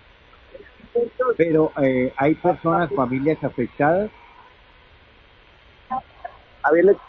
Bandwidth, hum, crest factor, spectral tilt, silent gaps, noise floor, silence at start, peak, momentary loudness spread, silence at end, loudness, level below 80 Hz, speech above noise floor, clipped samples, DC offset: 4.7 kHz; none; 18 dB; -10 dB/octave; none; -51 dBFS; 0.55 s; -4 dBFS; 12 LU; 0.1 s; -21 LUFS; -52 dBFS; 32 dB; under 0.1%; under 0.1%